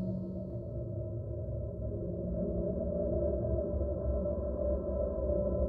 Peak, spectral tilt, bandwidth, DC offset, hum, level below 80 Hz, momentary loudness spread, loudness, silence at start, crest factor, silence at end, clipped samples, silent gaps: -20 dBFS; -14 dB/octave; 1.7 kHz; under 0.1%; none; -40 dBFS; 6 LU; -36 LUFS; 0 s; 14 dB; 0 s; under 0.1%; none